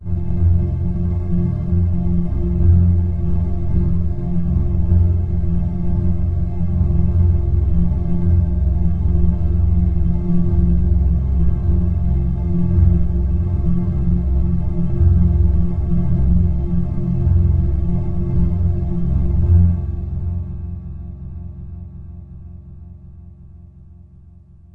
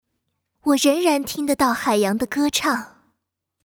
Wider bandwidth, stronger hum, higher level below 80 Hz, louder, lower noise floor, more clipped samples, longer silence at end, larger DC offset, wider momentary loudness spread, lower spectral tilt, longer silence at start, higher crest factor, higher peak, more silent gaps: second, 2.2 kHz vs over 20 kHz; neither; first, -22 dBFS vs -58 dBFS; about the same, -18 LUFS vs -20 LUFS; second, -43 dBFS vs -78 dBFS; neither; about the same, 0.75 s vs 0.75 s; neither; first, 13 LU vs 6 LU; first, -12.5 dB/octave vs -3 dB/octave; second, 0 s vs 0.65 s; about the same, 16 dB vs 16 dB; first, 0 dBFS vs -6 dBFS; neither